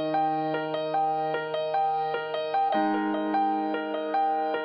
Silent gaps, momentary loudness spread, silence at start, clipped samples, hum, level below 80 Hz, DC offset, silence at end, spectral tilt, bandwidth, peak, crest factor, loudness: none; 4 LU; 0 s; under 0.1%; none; -80 dBFS; under 0.1%; 0 s; -8 dB/octave; 5.4 kHz; -14 dBFS; 12 dB; -27 LUFS